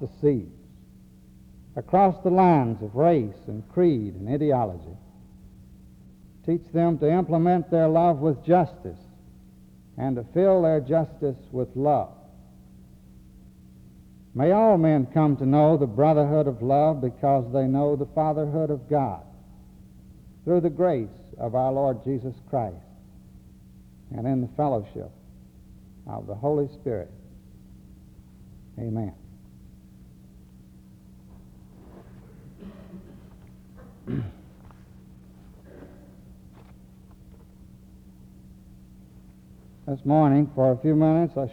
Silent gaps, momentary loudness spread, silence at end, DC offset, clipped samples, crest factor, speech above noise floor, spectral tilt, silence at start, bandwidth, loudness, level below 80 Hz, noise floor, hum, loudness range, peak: none; 20 LU; 0 s; under 0.1%; under 0.1%; 18 dB; 28 dB; -10.5 dB/octave; 0 s; 5.4 kHz; -23 LUFS; -54 dBFS; -51 dBFS; none; 18 LU; -8 dBFS